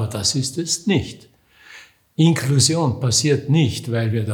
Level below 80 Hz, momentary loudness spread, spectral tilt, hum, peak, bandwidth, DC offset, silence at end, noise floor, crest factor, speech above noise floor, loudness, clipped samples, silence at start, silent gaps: -54 dBFS; 6 LU; -4.5 dB/octave; none; -4 dBFS; 18.5 kHz; under 0.1%; 0 s; -46 dBFS; 16 dB; 28 dB; -19 LUFS; under 0.1%; 0 s; none